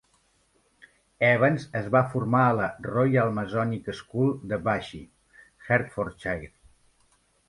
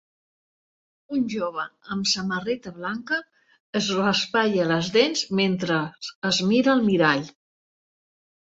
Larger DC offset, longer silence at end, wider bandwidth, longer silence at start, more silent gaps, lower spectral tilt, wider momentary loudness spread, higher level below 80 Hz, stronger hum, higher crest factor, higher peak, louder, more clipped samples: neither; second, 1 s vs 1.15 s; first, 11.5 kHz vs 8 kHz; about the same, 1.2 s vs 1.1 s; second, none vs 3.60-3.73 s, 6.15-6.22 s; first, -8 dB/octave vs -4.5 dB/octave; about the same, 11 LU vs 11 LU; first, -56 dBFS vs -64 dBFS; neither; about the same, 20 dB vs 20 dB; second, -8 dBFS vs -4 dBFS; second, -26 LUFS vs -23 LUFS; neither